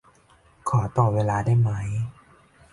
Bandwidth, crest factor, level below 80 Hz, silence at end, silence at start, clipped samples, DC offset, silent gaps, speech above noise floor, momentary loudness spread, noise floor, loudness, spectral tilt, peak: 11.5 kHz; 16 dB; -48 dBFS; 0.6 s; 0.65 s; under 0.1%; under 0.1%; none; 35 dB; 10 LU; -57 dBFS; -24 LUFS; -8 dB/octave; -8 dBFS